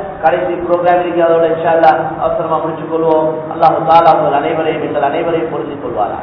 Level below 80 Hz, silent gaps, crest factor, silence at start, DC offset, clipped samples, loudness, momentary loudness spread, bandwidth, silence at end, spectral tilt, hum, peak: -46 dBFS; none; 12 dB; 0 s; under 0.1%; 0.5%; -13 LUFS; 9 LU; 5.4 kHz; 0 s; -8.5 dB/octave; none; 0 dBFS